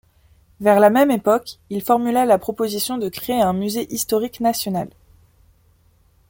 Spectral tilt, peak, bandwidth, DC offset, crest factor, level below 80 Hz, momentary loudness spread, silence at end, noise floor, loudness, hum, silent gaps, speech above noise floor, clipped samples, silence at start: -4.5 dB/octave; -2 dBFS; 17 kHz; under 0.1%; 18 dB; -54 dBFS; 11 LU; 1.4 s; -57 dBFS; -19 LUFS; none; none; 38 dB; under 0.1%; 0.6 s